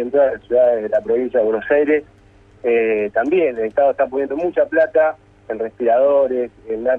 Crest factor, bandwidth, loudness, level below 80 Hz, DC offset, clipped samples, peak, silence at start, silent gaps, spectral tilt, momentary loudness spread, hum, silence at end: 14 dB; 4 kHz; -17 LUFS; -54 dBFS; under 0.1%; under 0.1%; -2 dBFS; 0 s; none; -7.5 dB/octave; 8 LU; none; 0 s